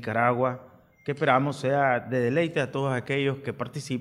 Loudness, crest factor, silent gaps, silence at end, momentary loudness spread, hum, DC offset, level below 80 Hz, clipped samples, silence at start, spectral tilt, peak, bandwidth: -26 LUFS; 20 dB; none; 0 s; 10 LU; none; under 0.1%; -68 dBFS; under 0.1%; 0 s; -6.5 dB/octave; -6 dBFS; 12.5 kHz